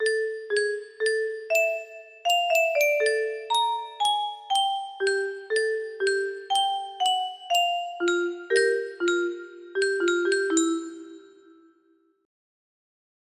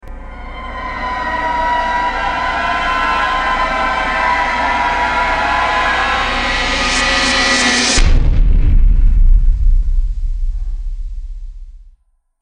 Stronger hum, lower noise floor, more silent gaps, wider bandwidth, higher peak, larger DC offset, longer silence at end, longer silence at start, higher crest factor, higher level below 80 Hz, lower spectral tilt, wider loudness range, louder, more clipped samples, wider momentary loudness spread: neither; first, -65 dBFS vs -53 dBFS; neither; first, 15.5 kHz vs 10 kHz; second, -10 dBFS vs -2 dBFS; neither; first, 2.05 s vs 0.5 s; about the same, 0 s vs 0.05 s; first, 18 dB vs 12 dB; second, -76 dBFS vs -16 dBFS; second, 0 dB/octave vs -3 dB/octave; about the same, 4 LU vs 5 LU; second, -25 LUFS vs -15 LUFS; neither; second, 7 LU vs 15 LU